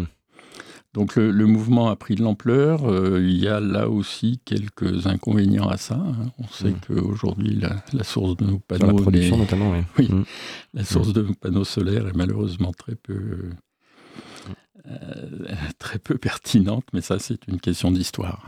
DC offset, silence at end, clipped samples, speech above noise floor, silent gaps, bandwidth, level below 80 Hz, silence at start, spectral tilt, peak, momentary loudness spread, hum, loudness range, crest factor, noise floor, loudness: under 0.1%; 0 s; under 0.1%; 29 dB; none; 14.5 kHz; -44 dBFS; 0 s; -7 dB/octave; -2 dBFS; 16 LU; none; 9 LU; 20 dB; -50 dBFS; -22 LUFS